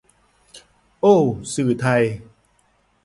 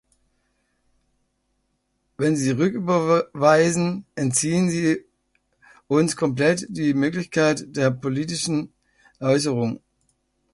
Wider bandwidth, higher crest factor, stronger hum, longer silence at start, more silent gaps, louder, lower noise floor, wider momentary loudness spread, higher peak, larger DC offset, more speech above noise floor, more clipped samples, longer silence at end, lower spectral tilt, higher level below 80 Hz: about the same, 11.5 kHz vs 11.5 kHz; about the same, 20 dB vs 20 dB; neither; second, 0.55 s vs 2.2 s; neither; first, -19 LUFS vs -22 LUFS; second, -62 dBFS vs -72 dBFS; about the same, 8 LU vs 8 LU; about the same, -2 dBFS vs -4 dBFS; neither; second, 45 dB vs 51 dB; neither; about the same, 0.8 s vs 0.75 s; first, -6.5 dB/octave vs -5 dB/octave; first, -54 dBFS vs -60 dBFS